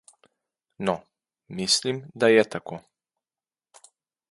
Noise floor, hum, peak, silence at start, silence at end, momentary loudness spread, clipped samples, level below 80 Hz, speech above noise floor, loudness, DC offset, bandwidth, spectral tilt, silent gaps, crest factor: under -90 dBFS; none; -4 dBFS; 0.8 s; 1.55 s; 20 LU; under 0.1%; -68 dBFS; over 66 dB; -24 LUFS; under 0.1%; 11.5 kHz; -3 dB/octave; none; 24 dB